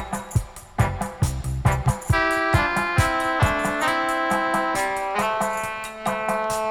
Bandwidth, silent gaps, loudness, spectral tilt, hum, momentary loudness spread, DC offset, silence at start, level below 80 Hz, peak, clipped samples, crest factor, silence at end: 19.5 kHz; none; -23 LUFS; -5 dB/octave; none; 7 LU; under 0.1%; 0 s; -34 dBFS; -6 dBFS; under 0.1%; 16 dB; 0 s